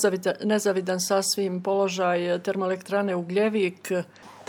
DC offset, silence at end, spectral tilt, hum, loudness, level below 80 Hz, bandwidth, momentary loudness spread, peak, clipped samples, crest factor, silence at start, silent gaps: under 0.1%; 0.05 s; -4 dB/octave; none; -25 LUFS; -80 dBFS; 19 kHz; 5 LU; -8 dBFS; under 0.1%; 18 dB; 0 s; none